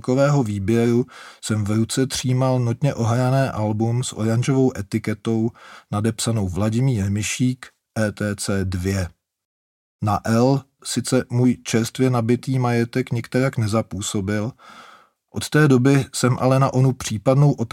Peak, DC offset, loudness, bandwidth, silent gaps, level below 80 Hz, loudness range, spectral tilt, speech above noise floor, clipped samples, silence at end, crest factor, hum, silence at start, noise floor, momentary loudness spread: -2 dBFS; under 0.1%; -21 LUFS; 16 kHz; 9.45-9.99 s; -52 dBFS; 4 LU; -6 dB/octave; over 70 dB; under 0.1%; 0.05 s; 18 dB; none; 0.05 s; under -90 dBFS; 8 LU